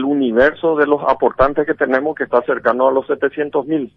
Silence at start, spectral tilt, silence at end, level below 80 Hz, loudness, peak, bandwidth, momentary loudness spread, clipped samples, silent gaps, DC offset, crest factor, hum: 0 s; -8 dB/octave; 0.1 s; -42 dBFS; -16 LUFS; 0 dBFS; 5.8 kHz; 5 LU; under 0.1%; none; under 0.1%; 16 dB; none